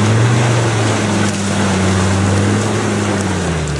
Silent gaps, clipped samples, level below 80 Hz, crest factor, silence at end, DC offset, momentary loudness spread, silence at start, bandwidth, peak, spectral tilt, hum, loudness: none; under 0.1%; -38 dBFS; 12 dB; 0 s; under 0.1%; 4 LU; 0 s; 11.5 kHz; -2 dBFS; -5 dB/octave; none; -15 LUFS